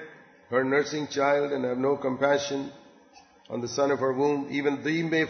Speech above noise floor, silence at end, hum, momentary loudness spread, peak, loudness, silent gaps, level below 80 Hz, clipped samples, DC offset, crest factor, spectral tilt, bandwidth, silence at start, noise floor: 29 dB; 0 s; none; 9 LU; -10 dBFS; -27 LUFS; none; -70 dBFS; under 0.1%; under 0.1%; 16 dB; -5 dB/octave; 6.6 kHz; 0 s; -55 dBFS